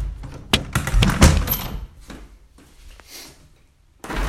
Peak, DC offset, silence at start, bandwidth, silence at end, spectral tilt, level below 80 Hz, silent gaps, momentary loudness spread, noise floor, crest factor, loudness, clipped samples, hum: 0 dBFS; under 0.1%; 0 s; 16 kHz; 0 s; -4.5 dB/octave; -26 dBFS; none; 26 LU; -55 dBFS; 22 dB; -19 LUFS; under 0.1%; none